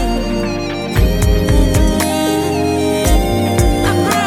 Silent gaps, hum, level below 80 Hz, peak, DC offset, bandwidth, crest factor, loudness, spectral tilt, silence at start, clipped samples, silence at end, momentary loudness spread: none; none; -18 dBFS; 0 dBFS; under 0.1%; 16.5 kHz; 14 dB; -15 LUFS; -5.5 dB/octave; 0 s; under 0.1%; 0 s; 5 LU